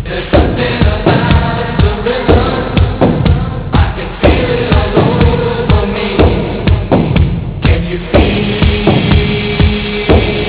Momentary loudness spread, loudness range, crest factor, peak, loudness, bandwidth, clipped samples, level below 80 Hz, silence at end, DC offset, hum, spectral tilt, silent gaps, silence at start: 4 LU; 1 LU; 10 dB; 0 dBFS; -11 LUFS; 4 kHz; 0.5%; -16 dBFS; 0 s; 0.4%; none; -11 dB/octave; none; 0 s